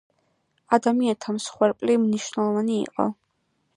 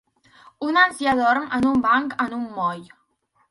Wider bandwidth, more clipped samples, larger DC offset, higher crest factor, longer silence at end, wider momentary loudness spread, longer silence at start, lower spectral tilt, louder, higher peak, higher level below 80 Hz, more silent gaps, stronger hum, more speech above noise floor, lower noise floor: about the same, 11 kHz vs 11.5 kHz; neither; neither; about the same, 20 dB vs 18 dB; about the same, 0.65 s vs 0.65 s; about the same, 7 LU vs 9 LU; about the same, 0.7 s vs 0.6 s; about the same, -5.5 dB/octave vs -4.5 dB/octave; second, -24 LUFS vs -21 LUFS; about the same, -4 dBFS vs -4 dBFS; second, -70 dBFS vs -56 dBFS; neither; neither; about the same, 49 dB vs 46 dB; first, -72 dBFS vs -66 dBFS